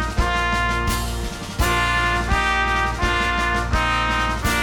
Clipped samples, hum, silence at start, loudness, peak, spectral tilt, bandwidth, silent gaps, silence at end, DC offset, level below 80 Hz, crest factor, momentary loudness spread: under 0.1%; none; 0 s; -20 LUFS; -6 dBFS; -4 dB/octave; 17 kHz; none; 0 s; under 0.1%; -26 dBFS; 14 dB; 5 LU